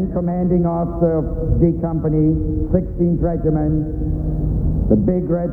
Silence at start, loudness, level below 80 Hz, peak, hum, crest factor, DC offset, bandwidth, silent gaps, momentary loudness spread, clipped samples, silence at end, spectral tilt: 0 s; -19 LUFS; -24 dBFS; -2 dBFS; none; 16 dB; under 0.1%; 2.3 kHz; none; 4 LU; under 0.1%; 0 s; -13.5 dB/octave